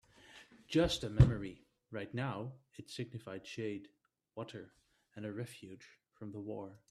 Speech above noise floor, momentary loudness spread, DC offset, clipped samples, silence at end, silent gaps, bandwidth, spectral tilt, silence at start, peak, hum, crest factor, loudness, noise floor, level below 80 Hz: 23 dB; 27 LU; under 0.1%; under 0.1%; 0.15 s; none; 12.5 kHz; -6.5 dB/octave; 0.3 s; -12 dBFS; none; 28 dB; -38 LUFS; -60 dBFS; -50 dBFS